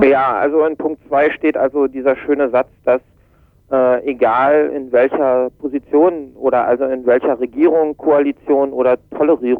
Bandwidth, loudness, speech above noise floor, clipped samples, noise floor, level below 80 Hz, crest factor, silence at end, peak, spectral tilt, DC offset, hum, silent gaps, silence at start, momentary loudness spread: 4.5 kHz; -15 LUFS; 37 dB; under 0.1%; -51 dBFS; -52 dBFS; 14 dB; 0 s; -2 dBFS; -8.5 dB/octave; under 0.1%; none; none; 0 s; 4 LU